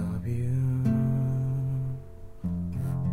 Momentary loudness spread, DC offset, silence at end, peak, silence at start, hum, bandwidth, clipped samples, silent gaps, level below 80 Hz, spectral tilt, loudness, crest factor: 10 LU; under 0.1%; 0 s; -14 dBFS; 0 s; none; 2.8 kHz; under 0.1%; none; -46 dBFS; -10 dB/octave; -29 LUFS; 14 dB